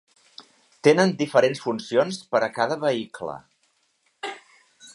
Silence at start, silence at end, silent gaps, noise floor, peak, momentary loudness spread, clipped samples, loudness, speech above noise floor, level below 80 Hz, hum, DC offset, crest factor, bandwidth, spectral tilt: 0.4 s; 0.05 s; none; -68 dBFS; -2 dBFS; 16 LU; under 0.1%; -23 LUFS; 46 dB; -72 dBFS; none; under 0.1%; 22 dB; 11.5 kHz; -5 dB/octave